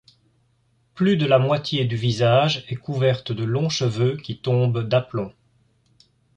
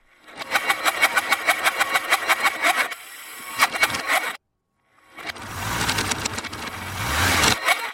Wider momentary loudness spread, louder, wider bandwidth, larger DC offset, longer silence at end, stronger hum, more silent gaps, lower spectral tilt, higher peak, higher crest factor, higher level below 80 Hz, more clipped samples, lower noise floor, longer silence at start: second, 10 LU vs 15 LU; about the same, -21 LUFS vs -21 LUFS; second, 8.6 kHz vs 16.5 kHz; neither; first, 1.05 s vs 0 s; neither; neither; first, -6.5 dB/octave vs -1.5 dB/octave; about the same, -4 dBFS vs -2 dBFS; about the same, 18 dB vs 22 dB; second, -56 dBFS vs -46 dBFS; neither; second, -64 dBFS vs -72 dBFS; first, 0.95 s vs 0.25 s